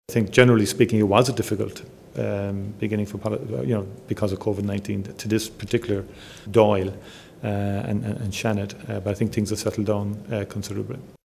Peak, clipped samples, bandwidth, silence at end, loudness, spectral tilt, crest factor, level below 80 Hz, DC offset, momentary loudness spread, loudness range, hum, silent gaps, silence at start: 0 dBFS; under 0.1%; 16 kHz; 0.15 s; -24 LUFS; -6 dB/octave; 22 dB; -48 dBFS; under 0.1%; 13 LU; 5 LU; none; none; 0.1 s